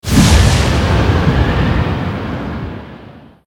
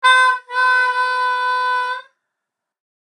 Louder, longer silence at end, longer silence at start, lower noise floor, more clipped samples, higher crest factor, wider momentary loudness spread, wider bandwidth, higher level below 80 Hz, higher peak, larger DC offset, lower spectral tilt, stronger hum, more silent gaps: first, -13 LUFS vs -16 LUFS; second, 0.25 s vs 1 s; about the same, 0.05 s vs 0 s; second, -37 dBFS vs -81 dBFS; neither; about the same, 14 dB vs 16 dB; first, 16 LU vs 8 LU; first, 18 kHz vs 11 kHz; first, -20 dBFS vs under -90 dBFS; about the same, 0 dBFS vs -2 dBFS; neither; first, -5.5 dB/octave vs 4 dB/octave; neither; neither